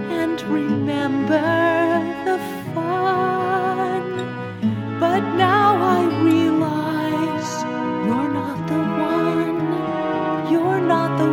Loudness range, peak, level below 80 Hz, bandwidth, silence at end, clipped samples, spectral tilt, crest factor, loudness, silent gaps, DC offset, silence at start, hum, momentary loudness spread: 3 LU; -4 dBFS; -58 dBFS; 16.5 kHz; 0 s; under 0.1%; -6.5 dB/octave; 16 dB; -20 LUFS; none; under 0.1%; 0 s; none; 7 LU